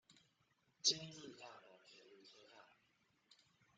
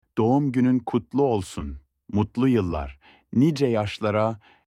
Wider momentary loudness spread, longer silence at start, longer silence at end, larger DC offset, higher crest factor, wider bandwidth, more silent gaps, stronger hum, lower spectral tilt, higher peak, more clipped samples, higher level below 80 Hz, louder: first, 26 LU vs 13 LU; about the same, 0.1 s vs 0.15 s; first, 1.15 s vs 0.3 s; neither; first, 30 dB vs 16 dB; second, 9 kHz vs 11.5 kHz; neither; neither; second, -1 dB/octave vs -7.5 dB/octave; second, -22 dBFS vs -8 dBFS; neither; second, under -90 dBFS vs -44 dBFS; second, -40 LUFS vs -23 LUFS